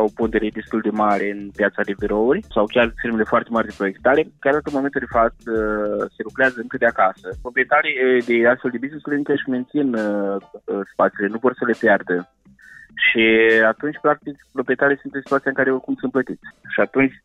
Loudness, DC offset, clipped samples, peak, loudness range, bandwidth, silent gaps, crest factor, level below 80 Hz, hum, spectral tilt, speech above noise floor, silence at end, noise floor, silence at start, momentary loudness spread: -20 LUFS; under 0.1%; under 0.1%; -6 dBFS; 3 LU; 9.8 kHz; none; 14 dB; -46 dBFS; none; -6.5 dB/octave; 26 dB; 0.1 s; -46 dBFS; 0 s; 9 LU